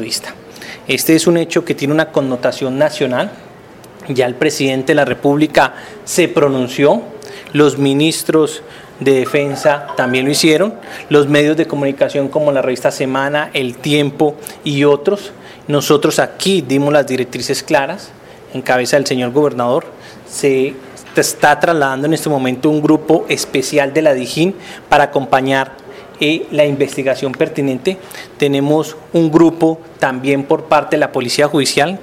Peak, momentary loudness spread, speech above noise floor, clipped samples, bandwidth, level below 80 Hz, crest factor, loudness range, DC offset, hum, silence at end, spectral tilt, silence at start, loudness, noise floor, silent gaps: 0 dBFS; 9 LU; 24 dB; under 0.1%; 16.5 kHz; -54 dBFS; 14 dB; 2 LU; under 0.1%; none; 0 s; -4.5 dB/octave; 0 s; -14 LUFS; -37 dBFS; none